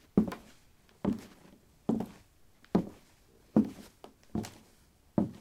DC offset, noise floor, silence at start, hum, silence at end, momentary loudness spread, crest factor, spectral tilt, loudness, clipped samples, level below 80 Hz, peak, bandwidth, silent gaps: under 0.1%; -63 dBFS; 0.15 s; none; 0.1 s; 19 LU; 24 dB; -8 dB/octave; -35 LUFS; under 0.1%; -60 dBFS; -10 dBFS; 15 kHz; none